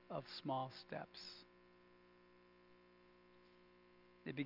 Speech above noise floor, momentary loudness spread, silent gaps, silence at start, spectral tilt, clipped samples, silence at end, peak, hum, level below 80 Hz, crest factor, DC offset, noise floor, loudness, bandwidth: 20 dB; 23 LU; none; 0 s; -4 dB/octave; under 0.1%; 0 s; -30 dBFS; 60 Hz at -75 dBFS; -84 dBFS; 22 dB; under 0.1%; -68 dBFS; -49 LUFS; 5.8 kHz